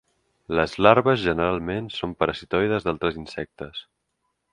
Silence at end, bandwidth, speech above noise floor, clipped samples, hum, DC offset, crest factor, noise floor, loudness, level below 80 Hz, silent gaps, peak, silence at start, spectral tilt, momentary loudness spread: 0.7 s; 10.5 kHz; 53 dB; under 0.1%; none; under 0.1%; 24 dB; -76 dBFS; -23 LUFS; -48 dBFS; none; 0 dBFS; 0.5 s; -6.5 dB/octave; 17 LU